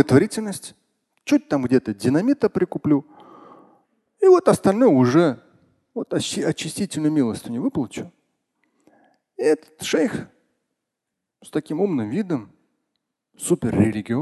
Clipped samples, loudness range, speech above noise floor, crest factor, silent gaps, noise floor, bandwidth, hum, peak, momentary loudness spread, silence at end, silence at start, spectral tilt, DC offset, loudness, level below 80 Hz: under 0.1%; 8 LU; 62 dB; 20 dB; none; -82 dBFS; 12.5 kHz; none; -2 dBFS; 15 LU; 0 s; 0 s; -6 dB/octave; under 0.1%; -21 LUFS; -54 dBFS